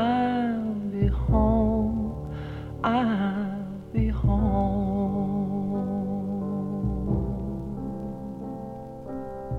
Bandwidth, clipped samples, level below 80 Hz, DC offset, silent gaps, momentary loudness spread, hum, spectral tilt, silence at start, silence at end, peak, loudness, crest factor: 4.7 kHz; under 0.1%; -34 dBFS; under 0.1%; none; 12 LU; none; -9.5 dB/octave; 0 s; 0 s; -10 dBFS; -27 LUFS; 16 dB